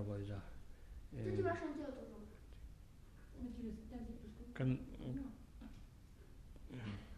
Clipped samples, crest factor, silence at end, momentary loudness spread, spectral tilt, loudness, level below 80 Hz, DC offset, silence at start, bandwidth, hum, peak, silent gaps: under 0.1%; 20 dB; 0 s; 20 LU; -8 dB/octave; -46 LUFS; -58 dBFS; under 0.1%; 0 s; 13.5 kHz; none; -26 dBFS; none